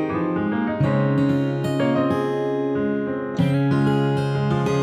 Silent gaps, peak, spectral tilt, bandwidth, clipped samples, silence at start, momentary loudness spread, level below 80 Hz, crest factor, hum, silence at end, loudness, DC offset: none; -8 dBFS; -8 dB/octave; 10 kHz; under 0.1%; 0 s; 4 LU; -54 dBFS; 12 dB; none; 0 s; -21 LUFS; under 0.1%